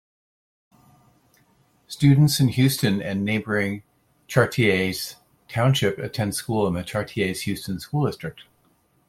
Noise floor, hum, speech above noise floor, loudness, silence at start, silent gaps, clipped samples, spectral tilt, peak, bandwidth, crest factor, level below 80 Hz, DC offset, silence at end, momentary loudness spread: -63 dBFS; none; 42 dB; -22 LUFS; 1.9 s; none; under 0.1%; -5.5 dB/octave; -2 dBFS; 16 kHz; 22 dB; -56 dBFS; under 0.1%; 0.65 s; 12 LU